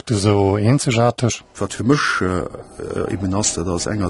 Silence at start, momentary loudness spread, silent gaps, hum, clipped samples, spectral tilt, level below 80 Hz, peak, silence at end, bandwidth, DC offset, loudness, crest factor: 0.05 s; 10 LU; none; none; under 0.1%; -5 dB/octave; -42 dBFS; -2 dBFS; 0 s; 11.5 kHz; under 0.1%; -19 LUFS; 16 dB